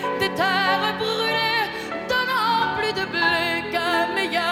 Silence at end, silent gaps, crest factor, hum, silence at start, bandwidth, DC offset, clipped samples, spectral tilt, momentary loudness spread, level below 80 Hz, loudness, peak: 0 s; none; 16 dB; none; 0 s; 18 kHz; under 0.1%; under 0.1%; -3.5 dB/octave; 4 LU; -56 dBFS; -21 LUFS; -6 dBFS